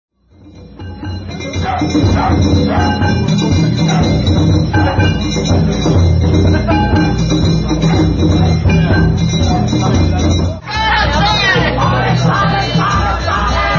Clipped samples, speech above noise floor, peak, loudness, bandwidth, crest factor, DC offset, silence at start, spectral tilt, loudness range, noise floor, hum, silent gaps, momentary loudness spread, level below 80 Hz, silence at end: under 0.1%; 29 dB; -2 dBFS; -12 LUFS; 7.2 kHz; 10 dB; under 0.1%; 0.45 s; -6 dB/octave; 1 LU; -40 dBFS; none; none; 5 LU; -20 dBFS; 0 s